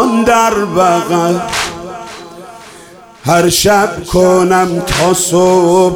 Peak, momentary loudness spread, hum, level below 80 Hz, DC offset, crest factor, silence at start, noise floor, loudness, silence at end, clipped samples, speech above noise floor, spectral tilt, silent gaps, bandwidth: 0 dBFS; 17 LU; none; -36 dBFS; under 0.1%; 12 dB; 0 s; -36 dBFS; -11 LUFS; 0 s; under 0.1%; 26 dB; -4 dB/octave; none; 17.5 kHz